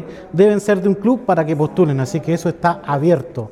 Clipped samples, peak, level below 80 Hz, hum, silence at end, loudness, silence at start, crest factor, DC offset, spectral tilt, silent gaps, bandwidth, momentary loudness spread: under 0.1%; 0 dBFS; -52 dBFS; none; 0 s; -17 LUFS; 0 s; 16 dB; under 0.1%; -7.5 dB/octave; none; 14 kHz; 6 LU